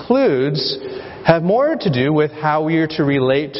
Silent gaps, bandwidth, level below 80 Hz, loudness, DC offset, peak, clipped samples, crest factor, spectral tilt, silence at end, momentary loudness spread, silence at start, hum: none; 6 kHz; -52 dBFS; -17 LUFS; under 0.1%; 0 dBFS; under 0.1%; 16 dB; -9.5 dB/octave; 0 s; 6 LU; 0 s; none